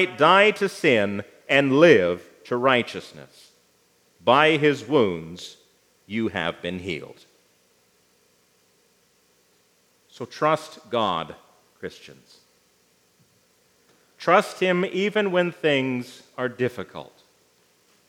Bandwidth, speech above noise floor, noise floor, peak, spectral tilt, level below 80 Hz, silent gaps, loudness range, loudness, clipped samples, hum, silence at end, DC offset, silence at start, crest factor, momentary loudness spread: 15.5 kHz; 41 dB; -63 dBFS; 0 dBFS; -5.5 dB/octave; -72 dBFS; none; 12 LU; -22 LUFS; under 0.1%; 60 Hz at -60 dBFS; 1.05 s; under 0.1%; 0 s; 24 dB; 22 LU